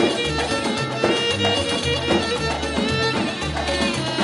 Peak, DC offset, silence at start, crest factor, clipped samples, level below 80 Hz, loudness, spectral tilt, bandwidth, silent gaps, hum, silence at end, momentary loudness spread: -6 dBFS; under 0.1%; 0 s; 16 dB; under 0.1%; -38 dBFS; -21 LUFS; -4 dB/octave; 11.5 kHz; none; none; 0 s; 4 LU